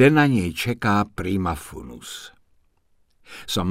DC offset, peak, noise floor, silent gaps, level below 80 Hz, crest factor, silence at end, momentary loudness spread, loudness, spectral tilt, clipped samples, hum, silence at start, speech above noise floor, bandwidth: under 0.1%; -2 dBFS; -62 dBFS; none; -46 dBFS; 20 dB; 0 s; 19 LU; -22 LUFS; -6 dB/octave; under 0.1%; none; 0 s; 41 dB; 16 kHz